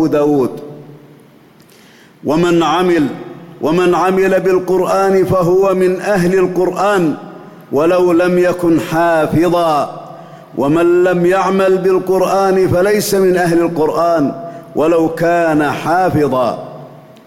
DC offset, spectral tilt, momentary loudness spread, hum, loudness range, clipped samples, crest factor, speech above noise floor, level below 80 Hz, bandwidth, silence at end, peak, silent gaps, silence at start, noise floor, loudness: under 0.1%; -6.5 dB/octave; 11 LU; none; 3 LU; under 0.1%; 8 dB; 32 dB; -46 dBFS; 16.5 kHz; 0.25 s; -4 dBFS; none; 0 s; -44 dBFS; -13 LUFS